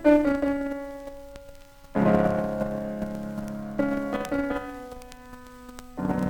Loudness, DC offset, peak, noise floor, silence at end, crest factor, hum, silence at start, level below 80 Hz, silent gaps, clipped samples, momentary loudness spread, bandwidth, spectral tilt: -27 LUFS; under 0.1%; -6 dBFS; -47 dBFS; 0 s; 20 dB; none; 0 s; -48 dBFS; none; under 0.1%; 23 LU; 18.5 kHz; -7.5 dB/octave